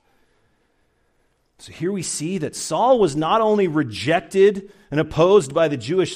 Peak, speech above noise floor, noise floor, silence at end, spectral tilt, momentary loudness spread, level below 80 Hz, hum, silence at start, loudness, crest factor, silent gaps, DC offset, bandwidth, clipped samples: -4 dBFS; 46 dB; -65 dBFS; 0 s; -5 dB/octave; 10 LU; -52 dBFS; none; 1.65 s; -19 LUFS; 16 dB; none; under 0.1%; 15 kHz; under 0.1%